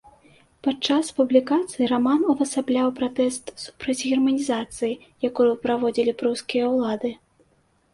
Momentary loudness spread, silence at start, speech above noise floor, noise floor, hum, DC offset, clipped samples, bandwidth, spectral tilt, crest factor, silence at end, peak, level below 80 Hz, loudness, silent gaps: 8 LU; 0.65 s; 41 dB; -64 dBFS; none; under 0.1%; under 0.1%; 11.5 kHz; -4 dB/octave; 18 dB; 0.8 s; -4 dBFS; -62 dBFS; -23 LUFS; none